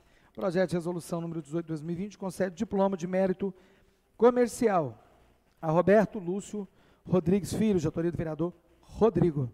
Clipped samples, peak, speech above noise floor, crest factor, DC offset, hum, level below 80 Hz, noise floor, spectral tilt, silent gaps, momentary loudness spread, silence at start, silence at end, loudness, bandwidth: under 0.1%; -10 dBFS; 35 dB; 18 dB; under 0.1%; none; -56 dBFS; -63 dBFS; -7 dB/octave; none; 12 LU; 0.35 s; 0 s; -29 LUFS; 15 kHz